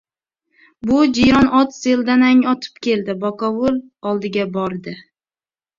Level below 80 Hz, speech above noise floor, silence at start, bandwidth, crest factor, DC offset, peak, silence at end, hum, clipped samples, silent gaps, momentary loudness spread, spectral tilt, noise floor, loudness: -46 dBFS; over 74 dB; 0.85 s; 7.4 kHz; 16 dB; under 0.1%; -2 dBFS; 0.75 s; none; under 0.1%; none; 12 LU; -5.5 dB/octave; under -90 dBFS; -17 LUFS